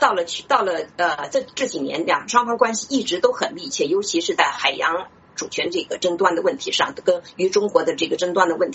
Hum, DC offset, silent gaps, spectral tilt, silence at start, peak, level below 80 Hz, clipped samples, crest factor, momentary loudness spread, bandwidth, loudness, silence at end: none; under 0.1%; none; -2.5 dB/octave; 0 s; -2 dBFS; -64 dBFS; under 0.1%; 20 dB; 6 LU; 8.2 kHz; -21 LUFS; 0 s